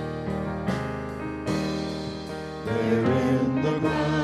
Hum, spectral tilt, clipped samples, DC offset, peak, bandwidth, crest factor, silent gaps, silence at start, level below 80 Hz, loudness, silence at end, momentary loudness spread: none; -7 dB/octave; under 0.1%; under 0.1%; -12 dBFS; 12.5 kHz; 14 dB; none; 0 s; -48 dBFS; -27 LUFS; 0 s; 10 LU